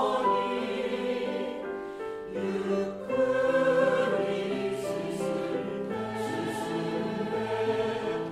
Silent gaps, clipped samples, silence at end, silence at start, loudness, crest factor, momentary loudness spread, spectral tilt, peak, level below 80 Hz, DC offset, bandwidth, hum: none; under 0.1%; 0 s; 0 s; -30 LUFS; 14 dB; 9 LU; -5.5 dB/octave; -14 dBFS; -64 dBFS; under 0.1%; 14 kHz; none